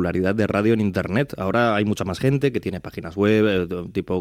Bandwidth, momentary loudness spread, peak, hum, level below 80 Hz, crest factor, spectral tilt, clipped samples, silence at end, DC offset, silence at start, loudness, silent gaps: 15 kHz; 9 LU; -6 dBFS; none; -50 dBFS; 14 dB; -7 dB/octave; under 0.1%; 0 s; under 0.1%; 0 s; -21 LUFS; none